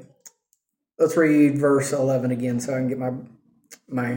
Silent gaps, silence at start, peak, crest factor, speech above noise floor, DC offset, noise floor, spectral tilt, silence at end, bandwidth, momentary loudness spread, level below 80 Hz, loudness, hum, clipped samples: none; 0.25 s; -6 dBFS; 16 dB; 50 dB; under 0.1%; -71 dBFS; -6.5 dB/octave; 0 s; 17 kHz; 12 LU; -68 dBFS; -22 LUFS; none; under 0.1%